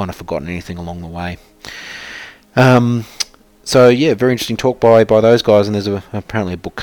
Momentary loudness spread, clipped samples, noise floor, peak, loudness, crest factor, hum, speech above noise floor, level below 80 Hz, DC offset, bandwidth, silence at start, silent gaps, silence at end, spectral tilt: 19 LU; under 0.1%; -34 dBFS; 0 dBFS; -14 LUFS; 14 dB; none; 20 dB; -44 dBFS; under 0.1%; 18.5 kHz; 0 s; none; 0 s; -6 dB/octave